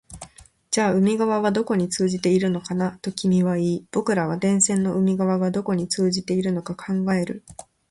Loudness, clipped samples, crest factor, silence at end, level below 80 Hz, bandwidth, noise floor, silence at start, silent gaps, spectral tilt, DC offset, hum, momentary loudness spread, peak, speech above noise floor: -22 LUFS; under 0.1%; 14 dB; 0.3 s; -58 dBFS; 11.5 kHz; -46 dBFS; 0.1 s; none; -5.5 dB/octave; under 0.1%; none; 7 LU; -8 dBFS; 25 dB